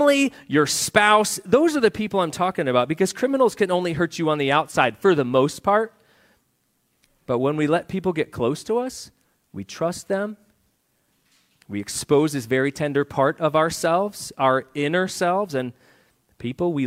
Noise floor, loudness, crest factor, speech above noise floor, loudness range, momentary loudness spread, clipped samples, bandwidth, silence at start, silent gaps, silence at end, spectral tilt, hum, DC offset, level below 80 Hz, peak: -69 dBFS; -21 LUFS; 20 dB; 47 dB; 8 LU; 10 LU; under 0.1%; 16 kHz; 0 s; none; 0 s; -4.5 dB/octave; none; under 0.1%; -60 dBFS; -2 dBFS